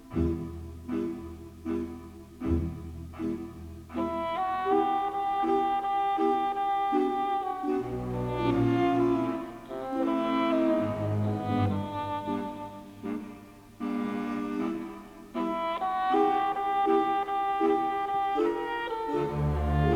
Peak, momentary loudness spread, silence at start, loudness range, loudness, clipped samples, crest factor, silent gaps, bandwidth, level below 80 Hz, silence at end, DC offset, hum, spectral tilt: -14 dBFS; 14 LU; 0 s; 7 LU; -29 LUFS; under 0.1%; 16 dB; none; 16.5 kHz; -44 dBFS; 0 s; under 0.1%; none; -8 dB/octave